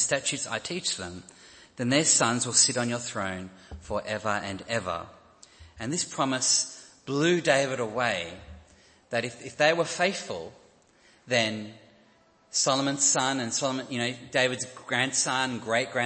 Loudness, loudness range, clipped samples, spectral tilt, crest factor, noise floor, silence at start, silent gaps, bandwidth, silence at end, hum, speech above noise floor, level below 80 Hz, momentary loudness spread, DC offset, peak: -26 LUFS; 4 LU; under 0.1%; -2.5 dB/octave; 22 dB; -61 dBFS; 0 s; none; 8.8 kHz; 0 s; none; 34 dB; -60 dBFS; 16 LU; under 0.1%; -6 dBFS